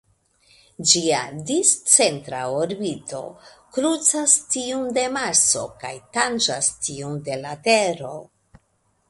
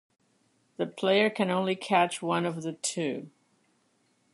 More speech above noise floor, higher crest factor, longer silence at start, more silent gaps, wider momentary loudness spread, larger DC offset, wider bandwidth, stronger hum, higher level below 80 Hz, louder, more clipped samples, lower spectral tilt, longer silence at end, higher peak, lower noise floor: about the same, 45 dB vs 42 dB; about the same, 22 dB vs 22 dB; about the same, 0.8 s vs 0.8 s; neither; first, 16 LU vs 10 LU; neither; about the same, 12 kHz vs 11.5 kHz; neither; first, -62 dBFS vs -82 dBFS; first, -20 LUFS vs -28 LUFS; neither; second, -1.5 dB/octave vs -4 dB/octave; second, 0.85 s vs 1.05 s; first, 0 dBFS vs -8 dBFS; about the same, -67 dBFS vs -70 dBFS